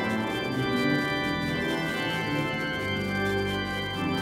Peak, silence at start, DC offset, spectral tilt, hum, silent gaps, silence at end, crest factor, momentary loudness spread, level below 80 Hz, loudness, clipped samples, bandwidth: -14 dBFS; 0 s; under 0.1%; -5.5 dB/octave; none; none; 0 s; 14 dB; 3 LU; -50 dBFS; -28 LUFS; under 0.1%; 16 kHz